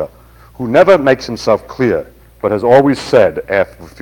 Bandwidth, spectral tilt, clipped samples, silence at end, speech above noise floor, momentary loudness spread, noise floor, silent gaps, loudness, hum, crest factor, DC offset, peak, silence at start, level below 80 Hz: 17.5 kHz; -6 dB/octave; 1%; 0.1 s; 29 dB; 12 LU; -41 dBFS; none; -12 LUFS; none; 12 dB; under 0.1%; 0 dBFS; 0 s; -44 dBFS